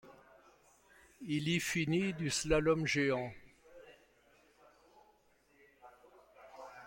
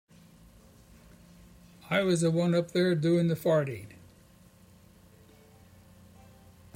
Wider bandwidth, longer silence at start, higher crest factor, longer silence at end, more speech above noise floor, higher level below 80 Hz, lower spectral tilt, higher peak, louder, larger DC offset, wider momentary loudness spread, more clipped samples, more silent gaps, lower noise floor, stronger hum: about the same, 16.5 kHz vs 16 kHz; second, 0.05 s vs 1.9 s; about the same, 22 dB vs 18 dB; second, 0 s vs 2.9 s; first, 36 dB vs 31 dB; first, -58 dBFS vs -64 dBFS; second, -4.5 dB/octave vs -6.5 dB/octave; about the same, -16 dBFS vs -14 dBFS; second, -34 LUFS vs -27 LUFS; neither; first, 23 LU vs 10 LU; neither; neither; first, -70 dBFS vs -57 dBFS; neither